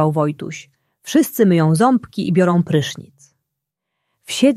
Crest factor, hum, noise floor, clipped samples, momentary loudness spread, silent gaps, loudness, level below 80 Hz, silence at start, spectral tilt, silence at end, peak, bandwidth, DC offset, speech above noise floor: 16 dB; none; -79 dBFS; under 0.1%; 17 LU; none; -17 LUFS; -60 dBFS; 0 s; -6 dB/octave; 0 s; -2 dBFS; 15.5 kHz; under 0.1%; 63 dB